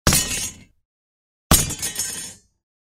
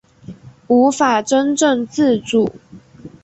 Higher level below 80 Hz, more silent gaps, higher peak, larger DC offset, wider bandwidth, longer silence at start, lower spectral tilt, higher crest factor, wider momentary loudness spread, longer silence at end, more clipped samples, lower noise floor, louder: first, -34 dBFS vs -54 dBFS; first, 0.85-1.50 s vs none; about the same, 0 dBFS vs -2 dBFS; neither; first, 16.5 kHz vs 8.4 kHz; second, 0.05 s vs 0.3 s; second, -2.5 dB/octave vs -4 dB/octave; first, 24 dB vs 14 dB; first, 14 LU vs 4 LU; first, 0.6 s vs 0.15 s; neither; first, under -90 dBFS vs -39 dBFS; second, -20 LUFS vs -16 LUFS